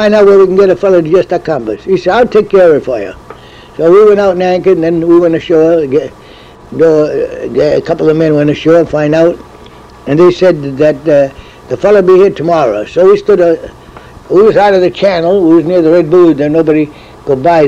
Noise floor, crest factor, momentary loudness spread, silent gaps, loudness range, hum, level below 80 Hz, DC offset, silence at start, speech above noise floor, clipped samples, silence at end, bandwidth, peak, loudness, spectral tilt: -34 dBFS; 8 dB; 10 LU; none; 2 LU; none; -40 dBFS; under 0.1%; 0 s; 26 dB; under 0.1%; 0 s; 8.4 kHz; 0 dBFS; -8 LUFS; -7.5 dB/octave